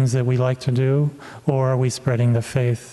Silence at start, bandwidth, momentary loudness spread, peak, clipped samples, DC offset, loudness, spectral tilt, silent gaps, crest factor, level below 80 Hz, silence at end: 0 s; 12 kHz; 4 LU; -4 dBFS; under 0.1%; under 0.1%; -21 LUFS; -7 dB/octave; none; 16 dB; -54 dBFS; 0 s